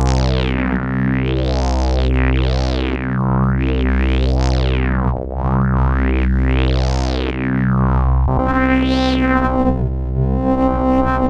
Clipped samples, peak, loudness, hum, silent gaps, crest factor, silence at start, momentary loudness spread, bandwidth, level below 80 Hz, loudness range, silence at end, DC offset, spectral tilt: under 0.1%; -2 dBFS; -17 LUFS; none; none; 14 dB; 0 s; 4 LU; 7.6 kHz; -20 dBFS; 1 LU; 0 s; under 0.1%; -7.5 dB/octave